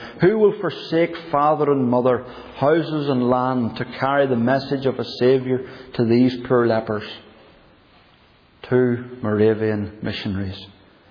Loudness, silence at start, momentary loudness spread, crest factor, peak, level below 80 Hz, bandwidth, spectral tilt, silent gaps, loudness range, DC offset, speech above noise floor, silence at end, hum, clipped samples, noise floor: -20 LUFS; 0 s; 10 LU; 16 dB; -4 dBFS; -56 dBFS; 5.4 kHz; -9 dB/octave; none; 4 LU; under 0.1%; 34 dB; 0.4 s; none; under 0.1%; -53 dBFS